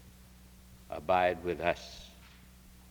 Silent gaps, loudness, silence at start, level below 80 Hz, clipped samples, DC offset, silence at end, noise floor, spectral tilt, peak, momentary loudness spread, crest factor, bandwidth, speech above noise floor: none; -32 LUFS; 0.05 s; -56 dBFS; under 0.1%; under 0.1%; 0.2 s; -56 dBFS; -5 dB/octave; -12 dBFS; 23 LU; 24 dB; over 20 kHz; 24 dB